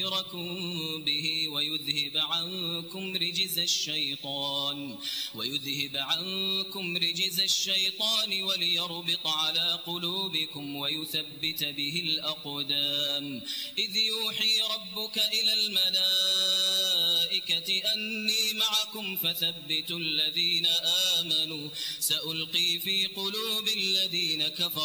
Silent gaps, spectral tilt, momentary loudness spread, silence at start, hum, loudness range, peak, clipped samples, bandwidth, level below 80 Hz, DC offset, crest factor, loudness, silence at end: none; -1.5 dB/octave; 8 LU; 0 s; none; 5 LU; -12 dBFS; under 0.1%; over 20 kHz; -78 dBFS; under 0.1%; 18 dB; -26 LUFS; 0 s